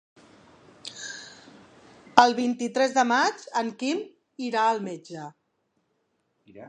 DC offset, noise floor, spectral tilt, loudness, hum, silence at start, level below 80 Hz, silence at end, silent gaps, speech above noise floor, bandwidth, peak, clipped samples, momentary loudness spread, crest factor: under 0.1%; -74 dBFS; -3 dB/octave; -24 LUFS; none; 0.85 s; -74 dBFS; 0 s; none; 49 dB; 10.5 kHz; 0 dBFS; under 0.1%; 21 LU; 28 dB